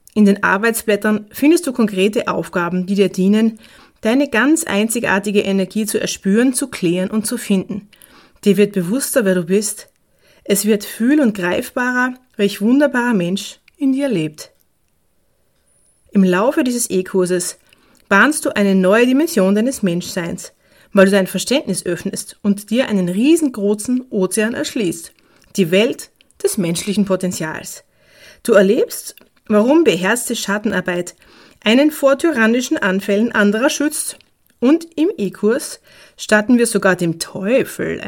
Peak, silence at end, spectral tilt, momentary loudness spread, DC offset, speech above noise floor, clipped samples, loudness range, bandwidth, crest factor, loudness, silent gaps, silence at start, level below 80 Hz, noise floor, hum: 0 dBFS; 0 s; -4.5 dB/octave; 10 LU; under 0.1%; 48 dB; under 0.1%; 4 LU; 17.5 kHz; 16 dB; -16 LUFS; none; 0.15 s; -56 dBFS; -64 dBFS; none